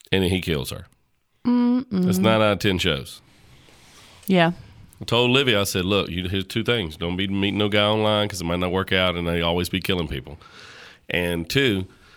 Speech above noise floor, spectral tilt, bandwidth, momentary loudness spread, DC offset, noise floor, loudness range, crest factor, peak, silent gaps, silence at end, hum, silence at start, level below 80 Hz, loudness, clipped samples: 44 dB; -5 dB/octave; over 20 kHz; 15 LU; under 0.1%; -66 dBFS; 2 LU; 20 dB; -2 dBFS; none; 0.3 s; none; 0.1 s; -46 dBFS; -22 LUFS; under 0.1%